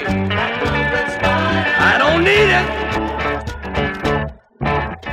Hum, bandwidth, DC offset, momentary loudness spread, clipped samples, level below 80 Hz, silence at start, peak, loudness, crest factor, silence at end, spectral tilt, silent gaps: none; 15.5 kHz; under 0.1%; 10 LU; under 0.1%; -32 dBFS; 0 s; -2 dBFS; -16 LUFS; 14 dB; 0 s; -5.5 dB/octave; none